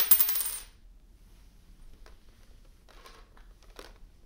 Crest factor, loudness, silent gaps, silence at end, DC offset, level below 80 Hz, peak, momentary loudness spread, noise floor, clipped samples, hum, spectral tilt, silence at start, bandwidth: 32 dB; -24 LUFS; none; 0.2 s; under 0.1%; -54 dBFS; -2 dBFS; 31 LU; -55 dBFS; under 0.1%; none; 0.5 dB/octave; 0 s; 17 kHz